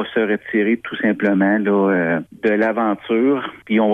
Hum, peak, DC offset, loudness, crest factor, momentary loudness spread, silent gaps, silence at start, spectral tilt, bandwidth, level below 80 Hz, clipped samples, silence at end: none; -4 dBFS; under 0.1%; -18 LUFS; 14 dB; 4 LU; none; 0 s; -8.5 dB/octave; 4.1 kHz; -62 dBFS; under 0.1%; 0 s